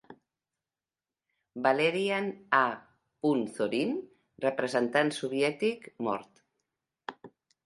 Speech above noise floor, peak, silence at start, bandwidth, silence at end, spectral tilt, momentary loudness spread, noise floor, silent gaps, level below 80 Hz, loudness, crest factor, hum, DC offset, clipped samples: over 61 dB; -8 dBFS; 0.1 s; 11.5 kHz; 0.35 s; -5 dB/octave; 17 LU; under -90 dBFS; none; -78 dBFS; -30 LUFS; 24 dB; none; under 0.1%; under 0.1%